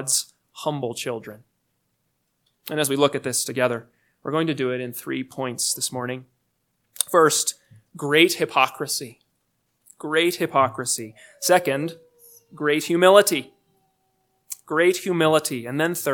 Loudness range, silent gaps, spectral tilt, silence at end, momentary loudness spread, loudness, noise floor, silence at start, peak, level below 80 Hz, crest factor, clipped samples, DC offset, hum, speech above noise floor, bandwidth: 6 LU; none; -3 dB/octave; 0 s; 15 LU; -22 LUFS; -73 dBFS; 0 s; 0 dBFS; -76 dBFS; 24 dB; under 0.1%; under 0.1%; none; 51 dB; 19 kHz